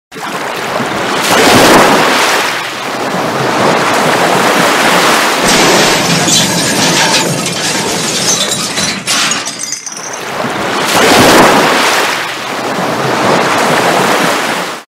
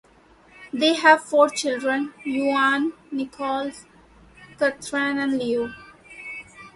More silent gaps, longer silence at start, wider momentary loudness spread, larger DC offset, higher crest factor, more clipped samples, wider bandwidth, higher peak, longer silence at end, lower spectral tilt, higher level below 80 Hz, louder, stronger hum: neither; second, 0.1 s vs 0.6 s; second, 11 LU vs 18 LU; neither; second, 10 dB vs 22 dB; first, 0.1% vs under 0.1%; first, 16.5 kHz vs 11.5 kHz; about the same, 0 dBFS vs -2 dBFS; about the same, 0.15 s vs 0.05 s; about the same, -2.5 dB/octave vs -3 dB/octave; first, -42 dBFS vs -62 dBFS; first, -9 LUFS vs -22 LUFS; neither